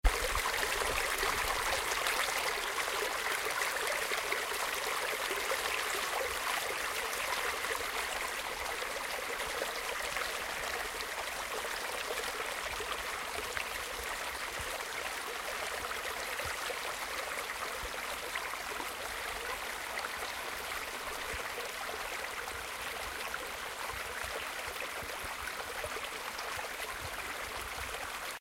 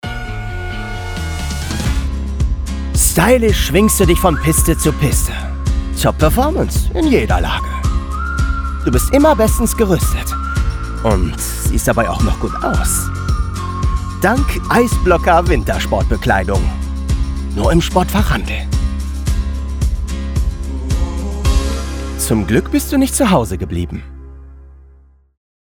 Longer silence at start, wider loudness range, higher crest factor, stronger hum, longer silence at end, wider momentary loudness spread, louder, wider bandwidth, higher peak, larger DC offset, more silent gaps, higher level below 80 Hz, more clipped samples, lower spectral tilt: about the same, 0.05 s vs 0.05 s; about the same, 6 LU vs 5 LU; first, 22 dB vs 14 dB; neither; second, 0 s vs 0.85 s; second, 7 LU vs 10 LU; second, -35 LUFS vs -16 LUFS; second, 16.5 kHz vs over 20 kHz; second, -14 dBFS vs 0 dBFS; neither; neither; second, -50 dBFS vs -20 dBFS; neither; second, -1 dB/octave vs -5 dB/octave